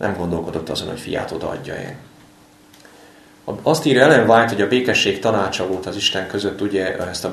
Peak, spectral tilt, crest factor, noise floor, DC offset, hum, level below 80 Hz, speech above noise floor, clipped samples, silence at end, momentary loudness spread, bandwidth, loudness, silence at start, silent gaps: 0 dBFS; -4.5 dB/octave; 20 dB; -48 dBFS; under 0.1%; none; -50 dBFS; 30 dB; under 0.1%; 0 s; 15 LU; 13 kHz; -18 LUFS; 0 s; none